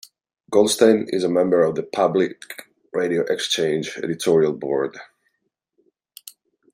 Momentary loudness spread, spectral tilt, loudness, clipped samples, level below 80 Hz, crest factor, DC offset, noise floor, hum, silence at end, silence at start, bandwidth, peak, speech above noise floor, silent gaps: 20 LU; -4.5 dB/octave; -20 LUFS; under 0.1%; -66 dBFS; 20 dB; under 0.1%; -75 dBFS; none; 1.7 s; 0.5 s; 16 kHz; -2 dBFS; 55 dB; none